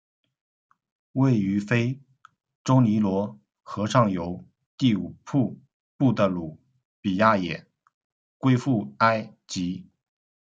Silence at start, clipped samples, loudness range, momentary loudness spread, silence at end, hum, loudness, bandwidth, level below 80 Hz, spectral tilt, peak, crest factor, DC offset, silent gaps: 1.15 s; under 0.1%; 2 LU; 13 LU; 0.7 s; none; -25 LUFS; 7.8 kHz; -66 dBFS; -7 dB/octave; -4 dBFS; 22 dB; under 0.1%; 2.55-2.65 s, 4.66-4.78 s, 5.73-5.99 s, 6.85-7.03 s, 7.94-8.40 s